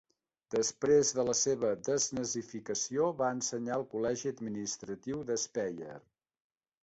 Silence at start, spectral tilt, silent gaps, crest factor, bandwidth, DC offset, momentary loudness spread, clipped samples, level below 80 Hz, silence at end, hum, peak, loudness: 0.5 s; -3.5 dB/octave; none; 18 dB; 8.4 kHz; under 0.1%; 11 LU; under 0.1%; -70 dBFS; 0.85 s; none; -16 dBFS; -33 LUFS